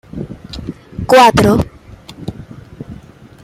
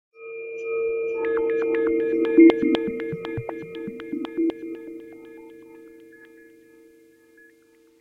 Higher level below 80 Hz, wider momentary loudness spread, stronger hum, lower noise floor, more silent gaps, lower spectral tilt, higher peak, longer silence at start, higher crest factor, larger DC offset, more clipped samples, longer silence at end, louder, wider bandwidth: first, -36 dBFS vs -60 dBFS; about the same, 25 LU vs 25 LU; neither; second, -38 dBFS vs -57 dBFS; neither; second, -5.5 dB/octave vs -8 dB/octave; first, 0 dBFS vs -4 dBFS; about the same, 0.15 s vs 0.2 s; second, 16 dB vs 22 dB; neither; neither; second, 0.5 s vs 1.85 s; first, -10 LUFS vs -23 LUFS; first, 16 kHz vs 4.9 kHz